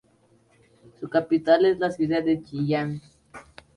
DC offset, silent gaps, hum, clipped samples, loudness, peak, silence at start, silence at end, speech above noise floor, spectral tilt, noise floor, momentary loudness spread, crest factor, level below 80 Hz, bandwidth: under 0.1%; none; none; under 0.1%; -23 LUFS; -6 dBFS; 1 s; 0.35 s; 39 dB; -7.5 dB/octave; -61 dBFS; 20 LU; 18 dB; -62 dBFS; 11 kHz